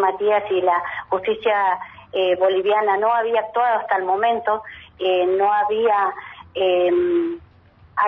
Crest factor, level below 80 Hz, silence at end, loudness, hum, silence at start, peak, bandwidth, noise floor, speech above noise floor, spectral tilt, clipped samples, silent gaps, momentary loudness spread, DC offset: 14 dB; -60 dBFS; 0 s; -20 LUFS; none; 0 s; -6 dBFS; 4 kHz; -50 dBFS; 31 dB; -7 dB/octave; under 0.1%; none; 9 LU; under 0.1%